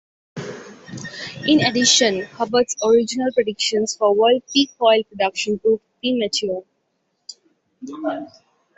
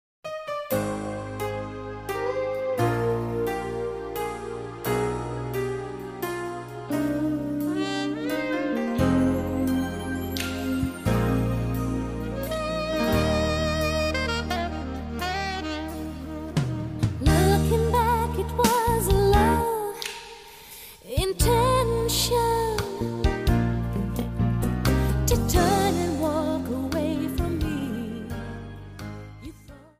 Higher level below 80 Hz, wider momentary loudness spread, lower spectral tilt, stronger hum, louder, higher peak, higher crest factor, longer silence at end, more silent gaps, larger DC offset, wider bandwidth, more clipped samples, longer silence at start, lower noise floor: second, -62 dBFS vs -34 dBFS; first, 21 LU vs 13 LU; second, -2.5 dB/octave vs -5.5 dB/octave; neither; first, -18 LUFS vs -26 LUFS; first, -2 dBFS vs -8 dBFS; about the same, 20 dB vs 18 dB; first, 0.5 s vs 0.15 s; neither; neither; second, 8.4 kHz vs 15.5 kHz; neither; about the same, 0.35 s vs 0.25 s; first, -70 dBFS vs -46 dBFS